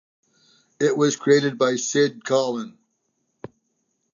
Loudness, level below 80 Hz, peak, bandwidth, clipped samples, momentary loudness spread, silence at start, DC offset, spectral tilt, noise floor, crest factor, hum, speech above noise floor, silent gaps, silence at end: -21 LUFS; -74 dBFS; -4 dBFS; 7.4 kHz; under 0.1%; 9 LU; 0.8 s; under 0.1%; -4 dB/octave; -73 dBFS; 18 dB; none; 52 dB; none; 1.45 s